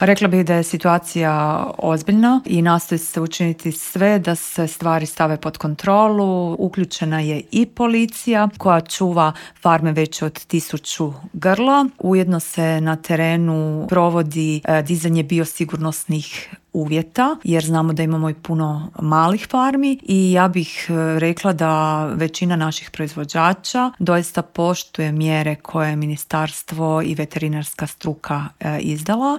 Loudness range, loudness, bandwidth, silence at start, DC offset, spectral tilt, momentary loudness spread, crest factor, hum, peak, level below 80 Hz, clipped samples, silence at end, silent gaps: 3 LU; -19 LUFS; 16.5 kHz; 0 s; under 0.1%; -6 dB/octave; 8 LU; 18 dB; none; 0 dBFS; -56 dBFS; under 0.1%; 0 s; none